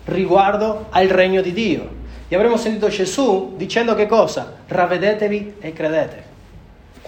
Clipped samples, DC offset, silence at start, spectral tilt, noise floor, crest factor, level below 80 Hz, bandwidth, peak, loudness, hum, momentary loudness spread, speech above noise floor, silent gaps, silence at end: under 0.1%; under 0.1%; 0.05 s; -5 dB/octave; -42 dBFS; 18 dB; -42 dBFS; 15.5 kHz; 0 dBFS; -18 LUFS; none; 10 LU; 25 dB; none; 0.5 s